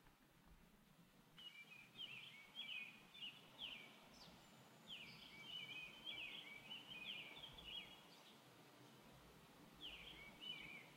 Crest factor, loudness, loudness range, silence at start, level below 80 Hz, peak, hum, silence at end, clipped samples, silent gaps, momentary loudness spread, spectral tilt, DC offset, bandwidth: 18 dB; -55 LUFS; 4 LU; 0 s; -80 dBFS; -40 dBFS; none; 0 s; under 0.1%; none; 14 LU; -2.5 dB/octave; under 0.1%; 16 kHz